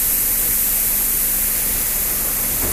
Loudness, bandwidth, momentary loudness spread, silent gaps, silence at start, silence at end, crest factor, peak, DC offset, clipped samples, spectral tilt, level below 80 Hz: -15 LUFS; 16 kHz; 2 LU; none; 0 s; 0 s; 14 dB; -6 dBFS; under 0.1%; under 0.1%; -1 dB/octave; -34 dBFS